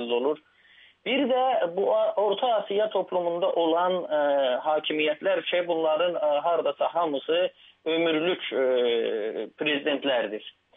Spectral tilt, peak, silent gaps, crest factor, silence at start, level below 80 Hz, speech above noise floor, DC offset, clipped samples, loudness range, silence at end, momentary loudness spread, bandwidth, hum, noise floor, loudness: -7.5 dB/octave; -12 dBFS; none; 14 dB; 0 s; -84 dBFS; 31 dB; under 0.1%; under 0.1%; 1 LU; 0.25 s; 5 LU; 3.9 kHz; none; -57 dBFS; -26 LUFS